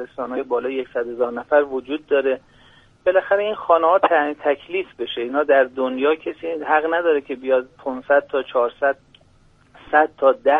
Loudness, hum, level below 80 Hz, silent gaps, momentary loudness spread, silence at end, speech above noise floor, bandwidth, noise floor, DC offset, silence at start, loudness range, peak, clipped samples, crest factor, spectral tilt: -20 LUFS; none; -60 dBFS; none; 11 LU; 0 s; 35 dB; 3.9 kHz; -54 dBFS; under 0.1%; 0 s; 3 LU; -2 dBFS; under 0.1%; 18 dB; -6 dB/octave